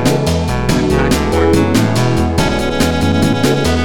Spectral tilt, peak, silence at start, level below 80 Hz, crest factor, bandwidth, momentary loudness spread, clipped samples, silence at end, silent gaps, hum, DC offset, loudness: -5.5 dB/octave; 0 dBFS; 0 s; -24 dBFS; 12 dB; 19 kHz; 3 LU; under 0.1%; 0 s; none; none; 4%; -13 LUFS